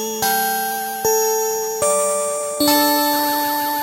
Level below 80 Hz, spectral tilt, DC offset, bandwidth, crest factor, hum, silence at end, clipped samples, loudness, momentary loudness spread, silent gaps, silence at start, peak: -58 dBFS; -1 dB/octave; under 0.1%; 16 kHz; 16 dB; none; 0 s; under 0.1%; -18 LUFS; 6 LU; none; 0 s; -2 dBFS